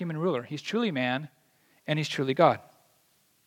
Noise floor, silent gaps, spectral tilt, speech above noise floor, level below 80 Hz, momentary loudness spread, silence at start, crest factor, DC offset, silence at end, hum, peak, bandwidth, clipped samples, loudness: -67 dBFS; none; -6 dB/octave; 40 dB; -82 dBFS; 12 LU; 0 s; 24 dB; under 0.1%; 0.85 s; none; -6 dBFS; 16.5 kHz; under 0.1%; -28 LUFS